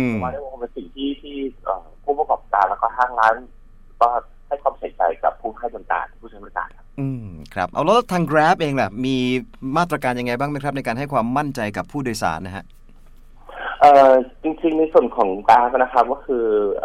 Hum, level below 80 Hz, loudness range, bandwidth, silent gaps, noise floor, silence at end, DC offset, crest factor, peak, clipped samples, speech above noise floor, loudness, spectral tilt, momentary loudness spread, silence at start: none; -44 dBFS; 9 LU; 15 kHz; none; -43 dBFS; 0 s; under 0.1%; 18 dB; -2 dBFS; under 0.1%; 24 dB; -20 LUFS; -6 dB/octave; 15 LU; 0 s